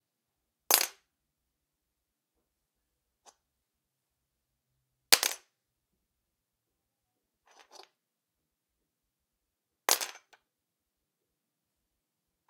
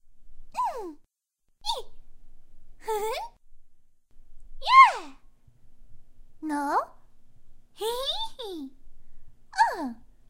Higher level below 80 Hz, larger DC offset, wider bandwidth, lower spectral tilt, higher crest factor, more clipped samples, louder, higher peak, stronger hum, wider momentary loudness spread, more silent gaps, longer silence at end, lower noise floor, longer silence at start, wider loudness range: second, -82 dBFS vs -48 dBFS; neither; about the same, 16 kHz vs 16 kHz; second, 2.5 dB/octave vs -2 dB/octave; first, 38 dB vs 26 dB; neither; about the same, -27 LUFS vs -25 LUFS; about the same, 0 dBFS vs -2 dBFS; neither; second, 13 LU vs 23 LU; neither; first, 2.4 s vs 0.25 s; first, -86 dBFS vs -71 dBFS; first, 0.7 s vs 0.05 s; second, 4 LU vs 13 LU